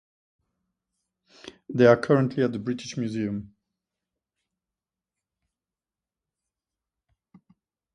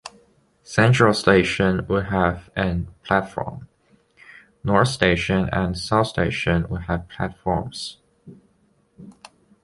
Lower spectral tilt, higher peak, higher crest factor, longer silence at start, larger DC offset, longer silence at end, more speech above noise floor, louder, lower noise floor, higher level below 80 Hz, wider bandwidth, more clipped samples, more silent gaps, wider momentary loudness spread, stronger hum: about the same, -7 dB/octave vs -6 dB/octave; second, -4 dBFS vs 0 dBFS; about the same, 24 dB vs 22 dB; first, 1.45 s vs 0.05 s; neither; first, 4.5 s vs 0.55 s; first, over 67 dB vs 42 dB; second, -24 LUFS vs -21 LUFS; first, under -90 dBFS vs -62 dBFS; second, -66 dBFS vs -40 dBFS; second, 10 kHz vs 11.5 kHz; neither; neither; about the same, 14 LU vs 14 LU; neither